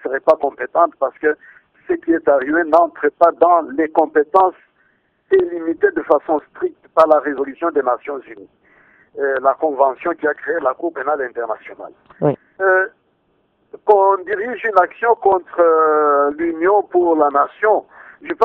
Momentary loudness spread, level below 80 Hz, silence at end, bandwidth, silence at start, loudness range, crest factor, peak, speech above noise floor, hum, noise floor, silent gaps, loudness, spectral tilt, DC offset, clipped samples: 10 LU; -60 dBFS; 0 s; 5.6 kHz; 0.05 s; 5 LU; 16 dB; 0 dBFS; 46 dB; none; -63 dBFS; none; -16 LUFS; -8 dB/octave; under 0.1%; under 0.1%